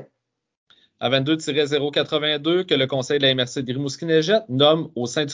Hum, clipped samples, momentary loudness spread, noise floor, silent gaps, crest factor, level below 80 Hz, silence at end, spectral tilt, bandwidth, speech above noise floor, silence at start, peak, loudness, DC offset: none; under 0.1%; 8 LU; -75 dBFS; 0.57-0.67 s; 18 dB; -66 dBFS; 0 s; -4.5 dB/octave; 7.8 kHz; 54 dB; 0 s; -4 dBFS; -20 LUFS; under 0.1%